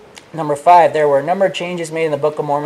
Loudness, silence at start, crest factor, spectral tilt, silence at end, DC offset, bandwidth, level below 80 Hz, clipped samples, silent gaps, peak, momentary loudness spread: -15 LUFS; 0.15 s; 14 dB; -5.5 dB/octave; 0 s; under 0.1%; 13 kHz; -62 dBFS; under 0.1%; none; 0 dBFS; 12 LU